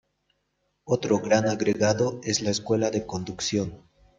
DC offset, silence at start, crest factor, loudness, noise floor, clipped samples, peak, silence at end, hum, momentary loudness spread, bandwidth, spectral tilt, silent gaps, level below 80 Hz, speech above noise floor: under 0.1%; 0.85 s; 20 dB; -25 LUFS; -75 dBFS; under 0.1%; -8 dBFS; 0.4 s; none; 7 LU; 9.4 kHz; -4.5 dB/octave; none; -60 dBFS; 50 dB